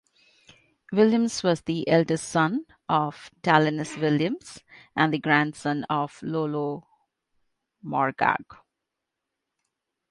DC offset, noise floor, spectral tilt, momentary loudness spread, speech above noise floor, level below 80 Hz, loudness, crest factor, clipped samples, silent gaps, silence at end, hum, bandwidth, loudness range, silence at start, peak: under 0.1%; -84 dBFS; -5.5 dB/octave; 11 LU; 59 dB; -66 dBFS; -25 LUFS; 22 dB; under 0.1%; none; 1.55 s; none; 11.5 kHz; 7 LU; 0.9 s; -4 dBFS